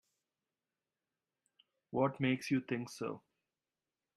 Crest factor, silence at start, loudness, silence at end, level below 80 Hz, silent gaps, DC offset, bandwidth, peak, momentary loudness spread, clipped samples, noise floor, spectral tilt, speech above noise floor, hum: 22 dB; 1.9 s; -37 LUFS; 1 s; -80 dBFS; none; under 0.1%; 13 kHz; -20 dBFS; 10 LU; under 0.1%; under -90 dBFS; -6 dB/octave; over 54 dB; none